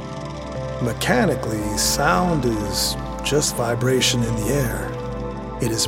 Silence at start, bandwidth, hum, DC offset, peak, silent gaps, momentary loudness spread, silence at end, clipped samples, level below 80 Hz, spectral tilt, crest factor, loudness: 0 s; 17 kHz; none; under 0.1%; -4 dBFS; none; 11 LU; 0 s; under 0.1%; -34 dBFS; -4 dB/octave; 18 dB; -21 LUFS